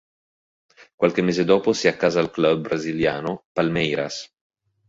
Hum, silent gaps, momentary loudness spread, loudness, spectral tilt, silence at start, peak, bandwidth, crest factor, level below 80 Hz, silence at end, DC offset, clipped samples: none; 0.94-0.98 s, 3.45-3.55 s; 8 LU; -21 LUFS; -5.5 dB/octave; 0.8 s; -4 dBFS; 7.8 kHz; 20 dB; -56 dBFS; 0.65 s; under 0.1%; under 0.1%